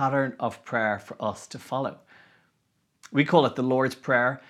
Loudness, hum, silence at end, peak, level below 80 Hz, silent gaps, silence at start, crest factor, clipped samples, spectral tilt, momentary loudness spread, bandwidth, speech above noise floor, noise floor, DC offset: -26 LUFS; none; 0.1 s; -4 dBFS; -74 dBFS; none; 0 s; 24 dB; under 0.1%; -6 dB/octave; 11 LU; 13 kHz; 47 dB; -72 dBFS; under 0.1%